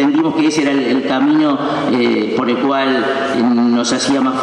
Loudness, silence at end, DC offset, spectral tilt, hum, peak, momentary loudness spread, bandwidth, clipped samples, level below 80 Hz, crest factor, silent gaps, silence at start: -14 LUFS; 0 s; under 0.1%; -4.5 dB/octave; none; -4 dBFS; 3 LU; 10.5 kHz; under 0.1%; -58 dBFS; 10 dB; none; 0 s